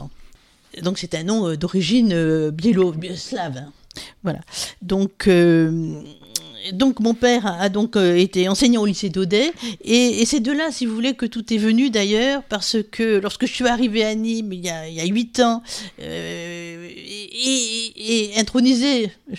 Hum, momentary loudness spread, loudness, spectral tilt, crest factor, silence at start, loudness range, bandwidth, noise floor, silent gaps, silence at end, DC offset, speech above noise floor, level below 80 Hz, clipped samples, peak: none; 13 LU; -20 LUFS; -4.5 dB/octave; 18 dB; 0 s; 5 LU; 15 kHz; -48 dBFS; none; 0 s; under 0.1%; 29 dB; -50 dBFS; under 0.1%; -2 dBFS